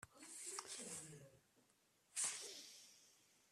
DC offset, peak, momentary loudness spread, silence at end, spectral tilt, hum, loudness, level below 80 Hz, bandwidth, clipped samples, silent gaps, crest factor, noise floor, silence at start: under 0.1%; -30 dBFS; 21 LU; 0.05 s; -0.5 dB/octave; none; -48 LUFS; -88 dBFS; 15.5 kHz; under 0.1%; none; 24 dB; -78 dBFS; 0 s